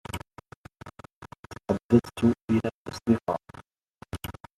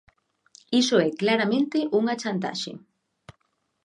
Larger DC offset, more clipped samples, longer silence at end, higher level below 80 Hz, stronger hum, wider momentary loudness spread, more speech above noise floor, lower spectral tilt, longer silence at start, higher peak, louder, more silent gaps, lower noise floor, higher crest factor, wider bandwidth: neither; neither; second, 0.25 s vs 1.05 s; first, -56 dBFS vs -72 dBFS; neither; first, 25 LU vs 11 LU; second, 30 dB vs 49 dB; first, -7.5 dB/octave vs -4.5 dB/octave; second, 0.15 s vs 0.7 s; about the same, -6 dBFS vs -8 dBFS; second, -27 LUFS vs -24 LUFS; first, 0.56-0.64 s, 1.16-1.22 s, 1.39-1.43 s, 1.84-1.89 s, 2.44-2.48 s, 2.74-2.85 s, 3.90-3.94 s vs none; second, -55 dBFS vs -72 dBFS; first, 24 dB vs 18 dB; first, 13 kHz vs 11 kHz